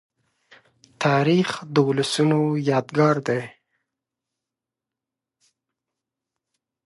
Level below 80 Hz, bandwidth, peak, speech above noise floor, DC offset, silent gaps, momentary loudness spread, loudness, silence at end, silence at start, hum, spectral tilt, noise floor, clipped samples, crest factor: -70 dBFS; 11.5 kHz; -6 dBFS; 67 dB; under 0.1%; none; 6 LU; -21 LUFS; 3.35 s; 1 s; none; -6 dB/octave; -87 dBFS; under 0.1%; 20 dB